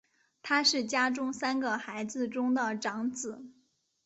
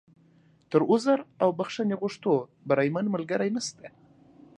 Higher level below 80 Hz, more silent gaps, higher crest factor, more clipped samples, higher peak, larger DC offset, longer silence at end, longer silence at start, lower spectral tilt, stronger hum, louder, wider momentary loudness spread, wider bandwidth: about the same, -78 dBFS vs -76 dBFS; neither; about the same, 18 dB vs 20 dB; neither; second, -14 dBFS vs -8 dBFS; neither; second, 0.55 s vs 0.7 s; second, 0.45 s vs 0.7 s; second, -2 dB/octave vs -6 dB/octave; neither; second, -31 LUFS vs -27 LUFS; first, 13 LU vs 6 LU; second, 8.2 kHz vs 11 kHz